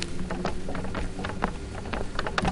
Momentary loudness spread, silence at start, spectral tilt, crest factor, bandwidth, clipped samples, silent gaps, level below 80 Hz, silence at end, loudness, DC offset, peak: 4 LU; 0 s; -5 dB/octave; 22 dB; 11 kHz; under 0.1%; none; -36 dBFS; 0 s; -32 LUFS; under 0.1%; -8 dBFS